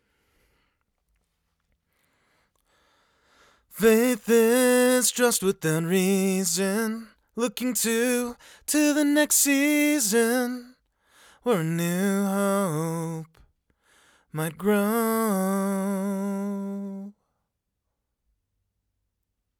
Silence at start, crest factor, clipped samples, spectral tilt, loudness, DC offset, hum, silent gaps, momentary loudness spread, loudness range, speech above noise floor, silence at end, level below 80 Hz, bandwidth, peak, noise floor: 3.75 s; 18 dB; under 0.1%; -4 dB/octave; -23 LUFS; under 0.1%; none; none; 15 LU; 7 LU; 57 dB; 2.5 s; -66 dBFS; over 20 kHz; -8 dBFS; -81 dBFS